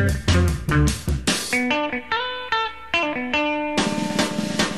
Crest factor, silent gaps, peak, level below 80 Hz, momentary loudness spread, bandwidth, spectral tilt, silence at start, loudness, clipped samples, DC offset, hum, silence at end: 16 dB; none; -6 dBFS; -34 dBFS; 4 LU; 14 kHz; -4.5 dB/octave; 0 s; -22 LUFS; under 0.1%; 0.5%; none; 0 s